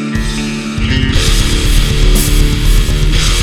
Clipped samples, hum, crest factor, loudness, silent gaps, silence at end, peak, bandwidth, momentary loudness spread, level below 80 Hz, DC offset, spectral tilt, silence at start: 0.3%; none; 10 dB; -13 LUFS; none; 0 s; 0 dBFS; 16.5 kHz; 5 LU; -12 dBFS; under 0.1%; -4 dB/octave; 0 s